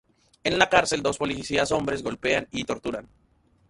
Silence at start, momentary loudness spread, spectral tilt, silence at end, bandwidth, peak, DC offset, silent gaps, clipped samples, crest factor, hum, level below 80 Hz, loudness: 0.45 s; 11 LU; -3.5 dB/octave; 0.65 s; 11.5 kHz; -2 dBFS; under 0.1%; none; under 0.1%; 24 dB; none; -52 dBFS; -25 LUFS